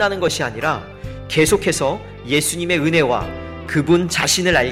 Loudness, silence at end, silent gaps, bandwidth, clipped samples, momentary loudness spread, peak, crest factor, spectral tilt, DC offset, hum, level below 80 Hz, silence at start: -18 LUFS; 0 s; none; 16.5 kHz; under 0.1%; 13 LU; -2 dBFS; 16 dB; -4 dB/octave; under 0.1%; none; -40 dBFS; 0 s